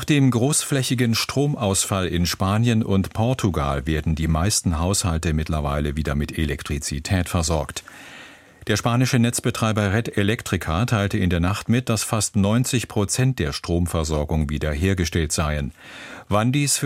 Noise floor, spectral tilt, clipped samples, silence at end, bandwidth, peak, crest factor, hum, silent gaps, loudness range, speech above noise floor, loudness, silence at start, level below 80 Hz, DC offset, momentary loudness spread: -44 dBFS; -5 dB/octave; under 0.1%; 0 s; 16 kHz; -4 dBFS; 16 dB; none; none; 3 LU; 23 dB; -22 LUFS; 0 s; -34 dBFS; under 0.1%; 6 LU